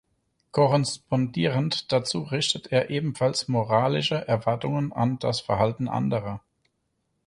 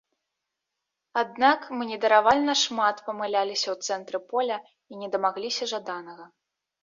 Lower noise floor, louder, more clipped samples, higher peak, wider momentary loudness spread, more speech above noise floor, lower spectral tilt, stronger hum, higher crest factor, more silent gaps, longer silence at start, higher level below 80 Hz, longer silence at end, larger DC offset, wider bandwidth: second, -75 dBFS vs -84 dBFS; about the same, -25 LUFS vs -25 LUFS; neither; about the same, -8 dBFS vs -6 dBFS; second, 5 LU vs 14 LU; second, 50 dB vs 58 dB; first, -5.5 dB/octave vs -2 dB/octave; neither; about the same, 18 dB vs 22 dB; neither; second, 0.55 s vs 1.15 s; first, -58 dBFS vs -68 dBFS; first, 0.9 s vs 0.6 s; neither; first, 11.5 kHz vs 7.6 kHz